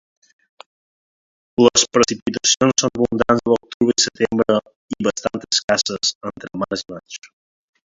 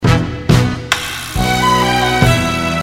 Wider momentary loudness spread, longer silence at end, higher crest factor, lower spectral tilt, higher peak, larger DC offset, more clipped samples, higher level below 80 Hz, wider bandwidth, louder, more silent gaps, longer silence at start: first, 16 LU vs 5 LU; first, 0.65 s vs 0 s; first, 20 dB vs 14 dB; second, -3 dB/octave vs -5 dB/octave; about the same, 0 dBFS vs 0 dBFS; neither; neither; second, -52 dBFS vs -28 dBFS; second, 7.8 kHz vs 16.5 kHz; second, -18 LUFS vs -14 LUFS; first, 2.22-2.26 s, 3.74-3.80 s, 4.76-4.88 s, 5.64-5.68 s, 6.15-6.21 s vs none; first, 1.6 s vs 0 s